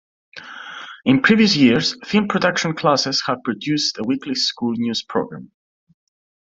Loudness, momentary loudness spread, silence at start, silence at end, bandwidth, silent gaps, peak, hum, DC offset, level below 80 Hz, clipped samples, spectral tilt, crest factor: -18 LUFS; 20 LU; 0.35 s; 1.05 s; 7.8 kHz; none; -2 dBFS; none; under 0.1%; -58 dBFS; under 0.1%; -4.5 dB/octave; 18 dB